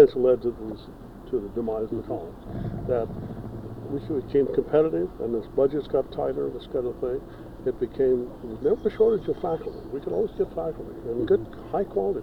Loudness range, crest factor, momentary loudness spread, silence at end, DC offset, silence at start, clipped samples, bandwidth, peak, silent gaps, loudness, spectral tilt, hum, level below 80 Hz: 5 LU; 22 dB; 13 LU; 0 s; under 0.1%; 0 s; under 0.1%; 5.4 kHz; -4 dBFS; none; -27 LUFS; -9 dB/octave; none; -46 dBFS